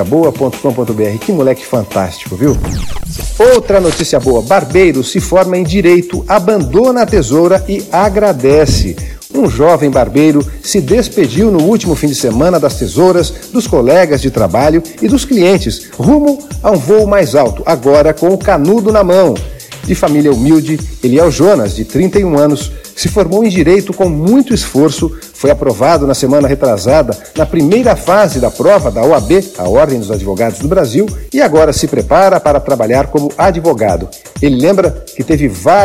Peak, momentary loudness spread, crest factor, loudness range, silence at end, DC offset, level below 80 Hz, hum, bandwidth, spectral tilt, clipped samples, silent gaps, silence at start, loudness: 0 dBFS; 7 LU; 10 dB; 1 LU; 0 s; 0.2%; -26 dBFS; none; 16.5 kHz; -6 dB/octave; 0.2%; none; 0 s; -10 LUFS